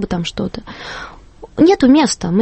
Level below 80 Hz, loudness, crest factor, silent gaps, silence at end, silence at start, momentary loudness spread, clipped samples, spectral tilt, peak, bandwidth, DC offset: -40 dBFS; -14 LUFS; 14 dB; none; 0 s; 0 s; 19 LU; under 0.1%; -5 dB/octave; -2 dBFS; 8.8 kHz; under 0.1%